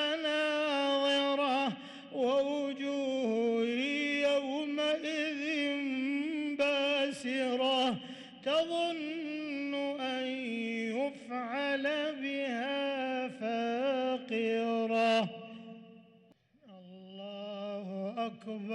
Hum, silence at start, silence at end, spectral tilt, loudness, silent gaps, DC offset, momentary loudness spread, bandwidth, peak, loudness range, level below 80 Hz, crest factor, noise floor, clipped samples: none; 0 s; 0 s; -4 dB/octave; -33 LUFS; none; under 0.1%; 11 LU; 11.5 kHz; -22 dBFS; 4 LU; -82 dBFS; 12 dB; -64 dBFS; under 0.1%